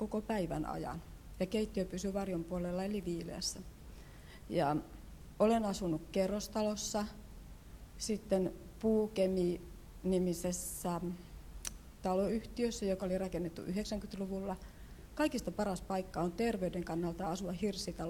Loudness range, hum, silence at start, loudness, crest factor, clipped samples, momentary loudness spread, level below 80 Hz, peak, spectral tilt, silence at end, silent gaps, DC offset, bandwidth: 3 LU; none; 0 s; -37 LUFS; 20 dB; under 0.1%; 19 LU; -54 dBFS; -18 dBFS; -5.5 dB/octave; 0 s; none; under 0.1%; 18 kHz